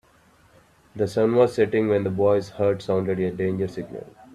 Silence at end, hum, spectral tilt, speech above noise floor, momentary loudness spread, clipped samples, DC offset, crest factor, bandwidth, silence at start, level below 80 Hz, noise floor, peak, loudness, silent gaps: 0.3 s; none; -7.5 dB/octave; 35 dB; 14 LU; under 0.1%; under 0.1%; 18 dB; 12 kHz; 0.95 s; -60 dBFS; -57 dBFS; -6 dBFS; -23 LUFS; none